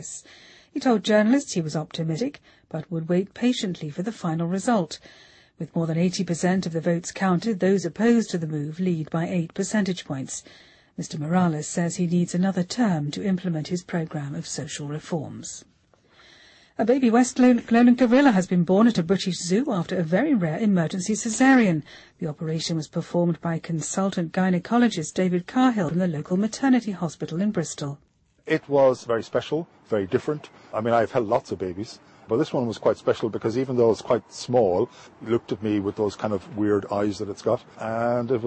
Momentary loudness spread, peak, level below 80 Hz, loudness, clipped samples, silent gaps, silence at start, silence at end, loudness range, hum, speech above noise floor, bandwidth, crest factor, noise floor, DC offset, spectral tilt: 12 LU; -8 dBFS; -62 dBFS; -24 LUFS; under 0.1%; none; 0 s; 0 s; 7 LU; none; 35 dB; 8.8 kHz; 16 dB; -58 dBFS; under 0.1%; -6 dB/octave